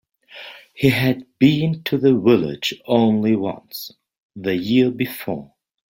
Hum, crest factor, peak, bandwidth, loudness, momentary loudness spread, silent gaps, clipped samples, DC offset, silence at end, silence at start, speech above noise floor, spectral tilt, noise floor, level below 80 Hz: none; 18 dB; -2 dBFS; 17 kHz; -19 LUFS; 16 LU; 4.18-4.30 s; under 0.1%; under 0.1%; 0.5 s; 0.35 s; 22 dB; -6.5 dB/octave; -41 dBFS; -56 dBFS